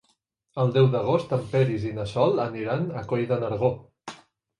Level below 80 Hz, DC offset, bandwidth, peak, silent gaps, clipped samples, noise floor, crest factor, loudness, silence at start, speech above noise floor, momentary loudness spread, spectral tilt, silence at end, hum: -56 dBFS; under 0.1%; 10.5 kHz; -8 dBFS; none; under 0.1%; -70 dBFS; 18 dB; -25 LUFS; 0.55 s; 47 dB; 17 LU; -8 dB/octave; 0.45 s; none